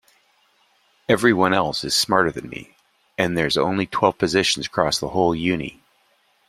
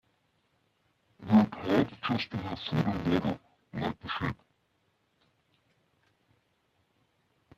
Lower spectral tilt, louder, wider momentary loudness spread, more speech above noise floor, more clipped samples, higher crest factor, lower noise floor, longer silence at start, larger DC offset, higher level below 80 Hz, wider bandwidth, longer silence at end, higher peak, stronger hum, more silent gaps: second, -4 dB/octave vs -7.5 dB/octave; first, -20 LUFS vs -30 LUFS; about the same, 16 LU vs 15 LU; about the same, 42 dB vs 42 dB; neither; about the same, 20 dB vs 22 dB; second, -62 dBFS vs -74 dBFS; about the same, 1.1 s vs 1.2 s; neither; first, -52 dBFS vs -60 dBFS; first, 15.5 kHz vs 7.4 kHz; second, 0.8 s vs 3.25 s; first, -2 dBFS vs -10 dBFS; neither; neither